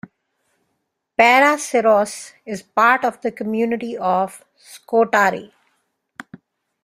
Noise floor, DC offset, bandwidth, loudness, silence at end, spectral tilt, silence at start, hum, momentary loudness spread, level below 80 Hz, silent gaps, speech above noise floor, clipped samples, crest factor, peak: -74 dBFS; under 0.1%; 15.5 kHz; -17 LUFS; 1.35 s; -3.5 dB/octave; 1.2 s; none; 18 LU; -66 dBFS; none; 56 dB; under 0.1%; 18 dB; -2 dBFS